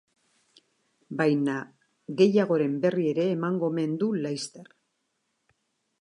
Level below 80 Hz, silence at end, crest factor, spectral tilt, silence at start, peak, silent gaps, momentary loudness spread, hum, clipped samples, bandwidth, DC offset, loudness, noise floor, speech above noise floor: -80 dBFS; 1.35 s; 20 dB; -6.5 dB/octave; 1.1 s; -8 dBFS; none; 16 LU; none; under 0.1%; 11 kHz; under 0.1%; -26 LUFS; -77 dBFS; 52 dB